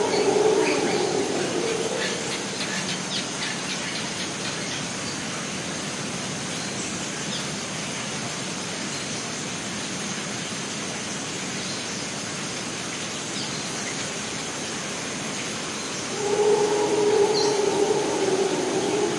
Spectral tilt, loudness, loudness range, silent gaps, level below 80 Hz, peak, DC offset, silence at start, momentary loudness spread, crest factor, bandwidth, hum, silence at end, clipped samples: -3 dB/octave; -26 LUFS; 6 LU; none; -62 dBFS; -10 dBFS; under 0.1%; 0 s; 8 LU; 18 dB; 11.5 kHz; none; 0 s; under 0.1%